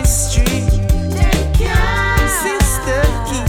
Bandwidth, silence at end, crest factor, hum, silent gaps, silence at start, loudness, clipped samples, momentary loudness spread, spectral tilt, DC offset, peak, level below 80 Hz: 18 kHz; 0 s; 12 dB; none; none; 0 s; -15 LUFS; under 0.1%; 2 LU; -4.5 dB/octave; under 0.1%; -2 dBFS; -16 dBFS